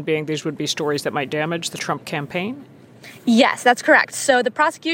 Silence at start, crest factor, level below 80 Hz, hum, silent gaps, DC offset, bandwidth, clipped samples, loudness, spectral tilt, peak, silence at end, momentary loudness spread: 0 s; 20 dB; -70 dBFS; none; none; under 0.1%; 17 kHz; under 0.1%; -19 LUFS; -3.5 dB/octave; -2 dBFS; 0 s; 11 LU